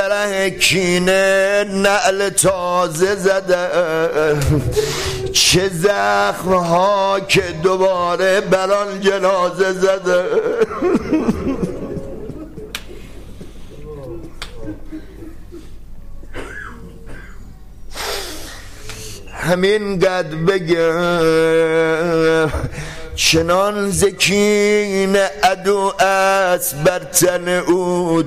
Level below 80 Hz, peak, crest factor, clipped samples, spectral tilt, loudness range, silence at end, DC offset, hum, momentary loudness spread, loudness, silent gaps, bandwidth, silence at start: -36 dBFS; -2 dBFS; 16 dB; under 0.1%; -4 dB/octave; 18 LU; 0 s; 0.7%; none; 18 LU; -16 LUFS; none; 16 kHz; 0 s